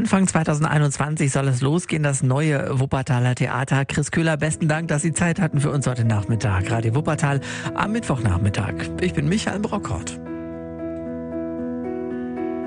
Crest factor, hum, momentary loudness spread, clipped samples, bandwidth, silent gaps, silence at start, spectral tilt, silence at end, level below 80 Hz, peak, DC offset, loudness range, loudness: 16 dB; none; 9 LU; under 0.1%; 10 kHz; none; 0 s; -6 dB/octave; 0 s; -48 dBFS; -4 dBFS; under 0.1%; 5 LU; -22 LUFS